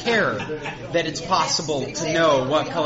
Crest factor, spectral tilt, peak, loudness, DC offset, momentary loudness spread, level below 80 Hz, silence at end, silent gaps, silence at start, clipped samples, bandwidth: 14 dB; -2.5 dB/octave; -8 dBFS; -22 LUFS; under 0.1%; 9 LU; -50 dBFS; 0 s; none; 0 s; under 0.1%; 8 kHz